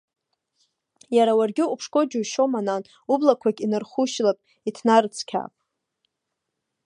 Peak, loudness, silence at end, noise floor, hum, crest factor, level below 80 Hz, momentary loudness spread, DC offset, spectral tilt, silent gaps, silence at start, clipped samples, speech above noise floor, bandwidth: -2 dBFS; -23 LUFS; 1.4 s; -81 dBFS; none; 22 dB; -78 dBFS; 11 LU; under 0.1%; -4.5 dB/octave; none; 1.1 s; under 0.1%; 59 dB; 11 kHz